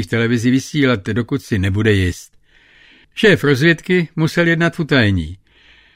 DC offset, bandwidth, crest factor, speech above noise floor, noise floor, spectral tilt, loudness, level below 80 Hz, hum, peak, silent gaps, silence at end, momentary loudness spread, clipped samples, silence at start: under 0.1%; 16 kHz; 16 dB; 34 dB; -49 dBFS; -6 dB/octave; -16 LUFS; -42 dBFS; none; -2 dBFS; none; 0.6 s; 8 LU; under 0.1%; 0 s